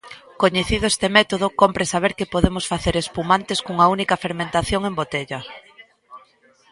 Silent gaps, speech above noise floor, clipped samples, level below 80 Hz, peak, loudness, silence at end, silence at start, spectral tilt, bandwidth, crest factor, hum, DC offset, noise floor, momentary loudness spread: none; 35 dB; under 0.1%; -38 dBFS; 0 dBFS; -20 LUFS; 0.55 s; 0.05 s; -4 dB/octave; 11.5 kHz; 20 dB; none; under 0.1%; -55 dBFS; 8 LU